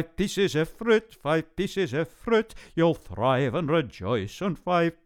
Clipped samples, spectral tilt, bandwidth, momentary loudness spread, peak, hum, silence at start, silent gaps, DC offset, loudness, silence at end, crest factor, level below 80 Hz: under 0.1%; -6 dB/octave; 16.5 kHz; 6 LU; -8 dBFS; none; 0 s; none; under 0.1%; -26 LUFS; 0.15 s; 18 dB; -50 dBFS